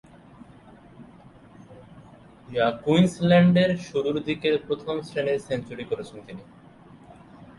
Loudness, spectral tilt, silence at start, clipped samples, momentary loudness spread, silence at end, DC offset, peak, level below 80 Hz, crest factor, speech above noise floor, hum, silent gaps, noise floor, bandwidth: -24 LUFS; -7 dB/octave; 1 s; under 0.1%; 15 LU; 0.15 s; under 0.1%; -6 dBFS; -58 dBFS; 20 dB; 26 dB; none; none; -50 dBFS; 11.5 kHz